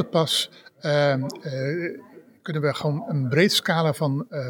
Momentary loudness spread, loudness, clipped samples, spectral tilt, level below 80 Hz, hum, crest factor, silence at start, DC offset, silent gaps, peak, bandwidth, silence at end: 13 LU; -24 LUFS; under 0.1%; -5 dB/octave; -72 dBFS; none; 18 dB; 0 s; under 0.1%; none; -6 dBFS; 18 kHz; 0 s